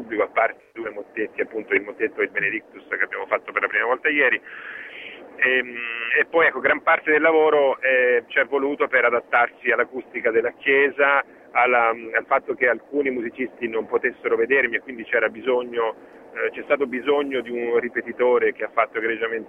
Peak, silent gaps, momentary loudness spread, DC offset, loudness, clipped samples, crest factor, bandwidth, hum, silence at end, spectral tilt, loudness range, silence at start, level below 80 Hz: -4 dBFS; none; 11 LU; under 0.1%; -21 LUFS; under 0.1%; 18 dB; 3.8 kHz; none; 0 s; -6 dB/octave; 5 LU; 0 s; -66 dBFS